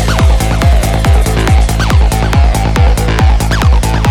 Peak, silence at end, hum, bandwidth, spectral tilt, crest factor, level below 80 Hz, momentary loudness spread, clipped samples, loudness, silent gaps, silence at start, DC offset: 0 dBFS; 0 s; none; 17 kHz; -5.5 dB/octave; 8 dB; -10 dBFS; 1 LU; under 0.1%; -10 LUFS; none; 0 s; under 0.1%